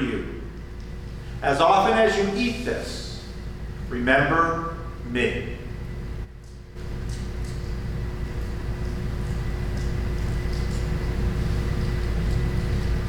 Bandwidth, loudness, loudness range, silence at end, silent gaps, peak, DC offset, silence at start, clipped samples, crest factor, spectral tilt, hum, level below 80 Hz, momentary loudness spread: 14.5 kHz; -26 LUFS; 9 LU; 0 s; none; -6 dBFS; under 0.1%; 0 s; under 0.1%; 20 dB; -6 dB/octave; none; -30 dBFS; 17 LU